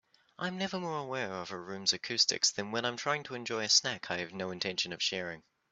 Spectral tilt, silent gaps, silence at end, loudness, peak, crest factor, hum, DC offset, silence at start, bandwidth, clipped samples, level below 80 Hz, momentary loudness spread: -1.5 dB/octave; none; 0.3 s; -32 LUFS; -12 dBFS; 22 dB; none; under 0.1%; 0.4 s; 8.2 kHz; under 0.1%; -76 dBFS; 12 LU